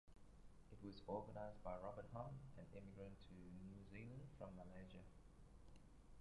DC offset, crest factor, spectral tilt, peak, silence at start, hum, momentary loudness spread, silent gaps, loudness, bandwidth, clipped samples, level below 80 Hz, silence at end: under 0.1%; 22 dB; -7.5 dB/octave; -36 dBFS; 0.05 s; none; 16 LU; none; -57 LUFS; 11 kHz; under 0.1%; -68 dBFS; 0 s